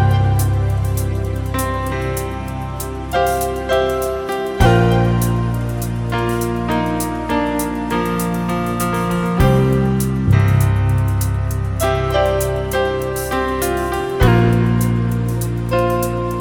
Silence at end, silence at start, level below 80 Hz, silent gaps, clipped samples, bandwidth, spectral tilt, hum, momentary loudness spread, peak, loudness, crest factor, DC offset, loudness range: 0 s; 0 s; -28 dBFS; none; under 0.1%; over 20 kHz; -6.5 dB/octave; none; 7 LU; 0 dBFS; -18 LUFS; 16 dB; under 0.1%; 4 LU